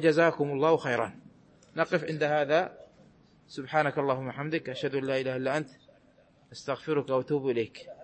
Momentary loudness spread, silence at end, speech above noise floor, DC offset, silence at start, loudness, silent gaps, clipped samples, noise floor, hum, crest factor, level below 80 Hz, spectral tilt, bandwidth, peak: 12 LU; 0 s; 33 dB; under 0.1%; 0 s; -29 LUFS; none; under 0.1%; -61 dBFS; none; 18 dB; -72 dBFS; -6.5 dB/octave; 8.8 kHz; -12 dBFS